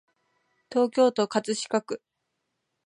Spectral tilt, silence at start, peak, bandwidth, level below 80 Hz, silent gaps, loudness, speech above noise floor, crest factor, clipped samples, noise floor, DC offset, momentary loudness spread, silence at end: -4 dB/octave; 0.7 s; -10 dBFS; 11 kHz; -78 dBFS; none; -26 LUFS; 55 dB; 20 dB; under 0.1%; -80 dBFS; under 0.1%; 12 LU; 0.9 s